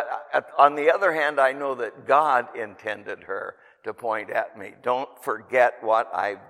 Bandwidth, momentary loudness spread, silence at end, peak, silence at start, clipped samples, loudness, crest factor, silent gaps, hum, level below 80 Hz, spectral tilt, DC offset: 15.5 kHz; 14 LU; 0.1 s; -2 dBFS; 0 s; under 0.1%; -23 LUFS; 22 dB; none; none; -80 dBFS; -4.5 dB/octave; under 0.1%